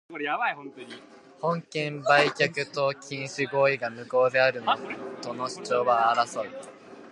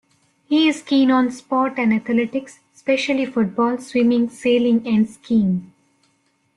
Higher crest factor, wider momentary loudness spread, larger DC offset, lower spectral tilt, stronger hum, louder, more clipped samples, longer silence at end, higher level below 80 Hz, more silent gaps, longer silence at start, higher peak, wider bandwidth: first, 22 dB vs 14 dB; first, 17 LU vs 5 LU; neither; second, -4 dB/octave vs -6 dB/octave; neither; second, -26 LUFS vs -19 LUFS; neither; second, 0 s vs 0.9 s; second, -78 dBFS vs -62 dBFS; neither; second, 0.1 s vs 0.5 s; about the same, -4 dBFS vs -6 dBFS; about the same, 11.5 kHz vs 11.5 kHz